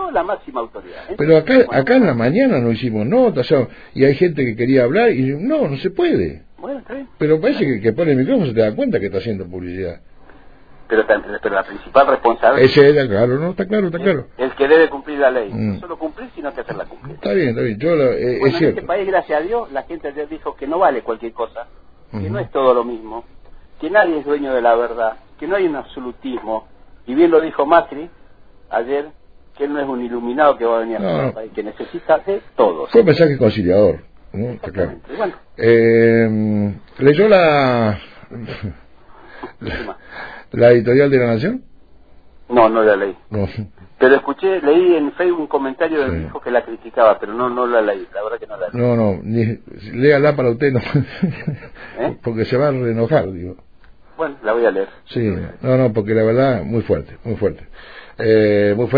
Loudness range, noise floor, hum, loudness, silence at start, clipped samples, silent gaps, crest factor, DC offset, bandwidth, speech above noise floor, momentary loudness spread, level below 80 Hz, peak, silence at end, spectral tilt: 6 LU; -46 dBFS; none; -16 LUFS; 0 s; under 0.1%; none; 16 dB; 0.5%; 5 kHz; 30 dB; 15 LU; -44 dBFS; 0 dBFS; 0 s; -9.5 dB/octave